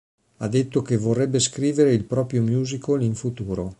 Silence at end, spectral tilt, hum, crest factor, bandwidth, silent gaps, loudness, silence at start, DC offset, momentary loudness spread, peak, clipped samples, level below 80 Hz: 0.05 s; -6 dB/octave; none; 16 dB; 11 kHz; none; -22 LUFS; 0.4 s; under 0.1%; 8 LU; -6 dBFS; under 0.1%; -50 dBFS